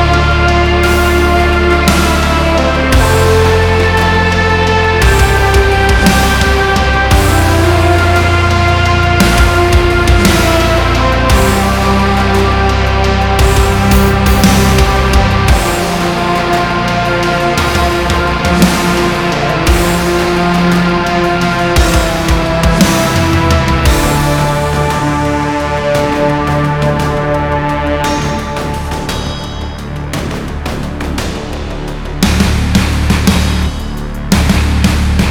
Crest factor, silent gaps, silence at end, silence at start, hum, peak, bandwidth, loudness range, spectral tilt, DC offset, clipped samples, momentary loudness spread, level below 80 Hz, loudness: 10 dB; none; 0 s; 0 s; none; 0 dBFS; over 20 kHz; 6 LU; -5 dB/octave; under 0.1%; under 0.1%; 9 LU; -16 dBFS; -11 LUFS